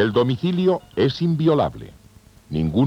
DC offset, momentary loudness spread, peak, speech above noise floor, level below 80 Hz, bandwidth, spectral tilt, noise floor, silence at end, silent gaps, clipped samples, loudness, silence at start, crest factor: under 0.1%; 7 LU; -6 dBFS; 30 dB; -48 dBFS; 9.4 kHz; -8.5 dB/octave; -49 dBFS; 0 s; none; under 0.1%; -21 LUFS; 0 s; 16 dB